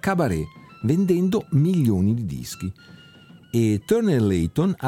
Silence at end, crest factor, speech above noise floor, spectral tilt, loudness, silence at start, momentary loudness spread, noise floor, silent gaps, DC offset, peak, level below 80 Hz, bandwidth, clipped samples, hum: 0 s; 14 dB; 27 dB; -7.5 dB/octave; -22 LUFS; 0.05 s; 11 LU; -48 dBFS; none; under 0.1%; -6 dBFS; -46 dBFS; 17 kHz; under 0.1%; none